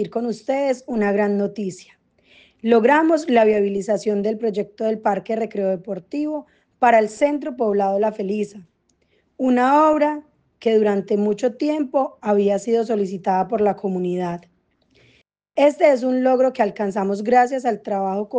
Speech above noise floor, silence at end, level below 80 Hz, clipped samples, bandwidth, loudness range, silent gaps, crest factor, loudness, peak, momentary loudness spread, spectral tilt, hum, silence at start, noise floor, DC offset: 45 dB; 0 s; -64 dBFS; under 0.1%; 9.4 kHz; 3 LU; none; 16 dB; -20 LUFS; -4 dBFS; 10 LU; -6.5 dB/octave; none; 0 s; -64 dBFS; under 0.1%